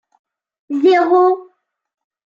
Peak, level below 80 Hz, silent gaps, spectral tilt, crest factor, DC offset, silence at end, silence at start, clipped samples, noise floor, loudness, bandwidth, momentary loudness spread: -4 dBFS; -78 dBFS; none; -4.5 dB/octave; 14 dB; under 0.1%; 0.9 s; 0.7 s; under 0.1%; -54 dBFS; -14 LUFS; 7.2 kHz; 12 LU